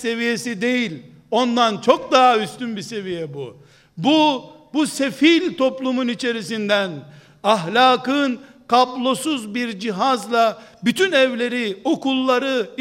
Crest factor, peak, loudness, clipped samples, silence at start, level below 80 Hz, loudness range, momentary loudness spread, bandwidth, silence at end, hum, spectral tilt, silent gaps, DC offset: 20 dB; 0 dBFS; -19 LUFS; under 0.1%; 0 s; -66 dBFS; 1 LU; 12 LU; 16 kHz; 0.05 s; none; -4 dB/octave; none; under 0.1%